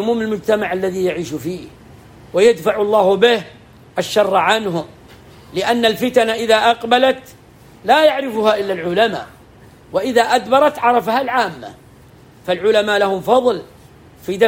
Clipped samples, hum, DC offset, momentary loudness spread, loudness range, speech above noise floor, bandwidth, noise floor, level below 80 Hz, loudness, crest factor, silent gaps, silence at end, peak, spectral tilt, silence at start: under 0.1%; none; under 0.1%; 14 LU; 2 LU; 28 dB; 16.5 kHz; -44 dBFS; -54 dBFS; -16 LUFS; 16 dB; none; 0 s; 0 dBFS; -4.5 dB/octave; 0 s